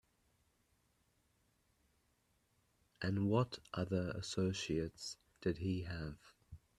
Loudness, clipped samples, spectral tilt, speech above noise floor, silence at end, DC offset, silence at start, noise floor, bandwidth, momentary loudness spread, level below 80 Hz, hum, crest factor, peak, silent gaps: -40 LUFS; under 0.1%; -6 dB/octave; 39 dB; 0.2 s; under 0.1%; 3 s; -78 dBFS; 12.5 kHz; 13 LU; -64 dBFS; none; 22 dB; -20 dBFS; none